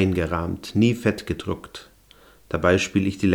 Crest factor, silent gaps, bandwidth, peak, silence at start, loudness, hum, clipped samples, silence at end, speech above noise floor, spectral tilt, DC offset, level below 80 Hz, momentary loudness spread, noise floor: 18 dB; none; 19.5 kHz; -4 dBFS; 0 s; -23 LUFS; none; under 0.1%; 0 s; 30 dB; -6 dB/octave; under 0.1%; -44 dBFS; 12 LU; -53 dBFS